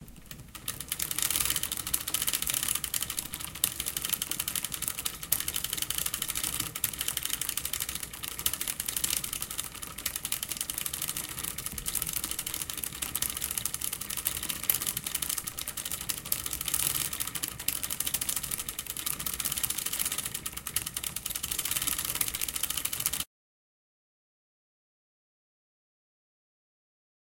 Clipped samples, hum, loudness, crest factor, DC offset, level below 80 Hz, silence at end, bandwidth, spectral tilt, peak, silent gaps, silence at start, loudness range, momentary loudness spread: under 0.1%; none; -30 LUFS; 30 dB; under 0.1%; -54 dBFS; 4.05 s; 17.5 kHz; 0 dB/octave; -4 dBFS; none; 0 s; 3 LU; 6 LU